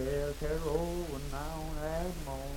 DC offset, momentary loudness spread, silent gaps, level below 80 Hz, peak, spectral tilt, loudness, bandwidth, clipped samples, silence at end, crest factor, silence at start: under 0.1%; 6 LU; none; -40 dBFS; -18 dBFS; -5.5 dB/octave; -37 LUFS; 18 kHz; under 0.1%; 0 s; 16 dB; 0 s